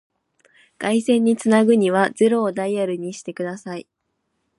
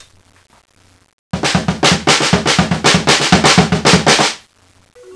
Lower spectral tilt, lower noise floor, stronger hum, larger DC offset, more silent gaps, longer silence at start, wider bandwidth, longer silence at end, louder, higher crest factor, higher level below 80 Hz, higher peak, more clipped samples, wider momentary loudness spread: first, -5.5 dB/octave vs -3.5 dB/octave; first, -73 dBFS vs -50 dBFS; neither; neither; neither; second, 0.8 s vs 1.35 s; about the same, 11.5 kHz vs 11 kHz; first, 0.8 s vs 0 s; second, -19 LUFS vs -11 LUFS; about the same, 18 dB vs 14 dB; second, -72 dBFS vs -36 dBFS; second, -4 dBFS vs 0 dBFS; neither; first, 14 LU vs 7 LU